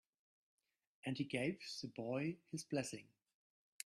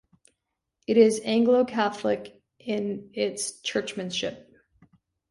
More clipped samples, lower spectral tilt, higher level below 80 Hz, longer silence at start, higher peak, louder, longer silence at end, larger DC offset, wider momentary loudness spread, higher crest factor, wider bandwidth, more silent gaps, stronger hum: neither; about the same, -5 dB/octave vs -4 dB/octave; second, -82 dBFS vs -68 dBFS; first, 1.05 s vs 0.9 s; second, -26 dBFS vs -6 dBFS; second, -44 LUFS vs -25 LUFS; about the same, 0.8 s vs 0.9 s; neither; second, 8 LU vs 12 LU; about the same, 20 dB vs 20 dB; first, 13.5 kHz vs 11.5 kHz; neither; neither